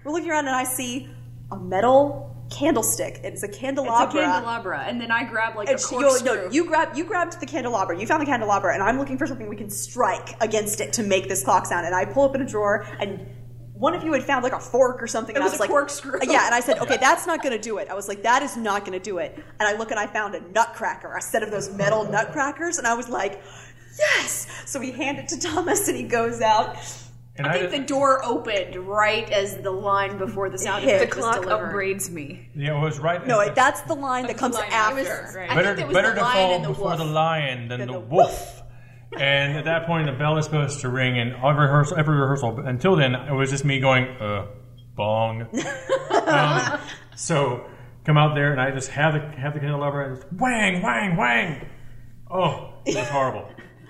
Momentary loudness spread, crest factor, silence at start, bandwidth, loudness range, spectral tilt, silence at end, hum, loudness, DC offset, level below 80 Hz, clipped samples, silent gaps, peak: 11 LU; 20 dB; 0 s; 15 kHz; 3 LU; -4.5 dB/octave; 0.05 s; none; -23 LUFS; under 0.1%; -50 dBFS; under 0.1%; none; -4 dBFS